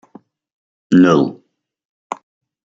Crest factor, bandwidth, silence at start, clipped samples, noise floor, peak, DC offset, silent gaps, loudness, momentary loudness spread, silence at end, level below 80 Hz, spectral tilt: 18 dB; 7.6 kHz; 0.9 s; under 0.1%; -46 dBFS; -2 dBFS; under 0.1%; 1.85-2.10 s; -13 LUFS; 20 LU; 0.5 s; -60 dBFS; -7 dB/octave